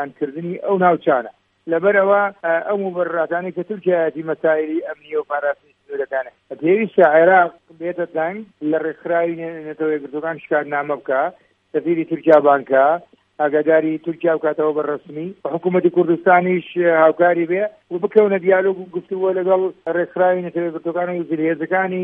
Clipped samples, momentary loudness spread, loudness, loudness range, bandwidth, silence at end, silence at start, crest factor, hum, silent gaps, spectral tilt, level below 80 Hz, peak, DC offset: under 0.1%; 12 LU; -18 LUFS; 5 LU; 3.8 kHz; 0 s; 0 s; 18 dB; none; none; -9.5 dB/octave; -72 dBFS; 0 dBFS; under 0.1%